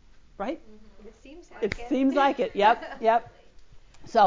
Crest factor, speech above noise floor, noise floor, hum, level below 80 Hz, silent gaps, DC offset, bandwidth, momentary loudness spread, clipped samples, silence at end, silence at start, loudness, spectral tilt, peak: 18 dB; 22 dB; -48 dBFS; none; -52 dBFS; none; under 0.1%; 7.6 kHz; 13 LU; under 0.1%; 0 s; 0.4 s; -25 LUFS; -5.5 dB/octave; -8 dBFS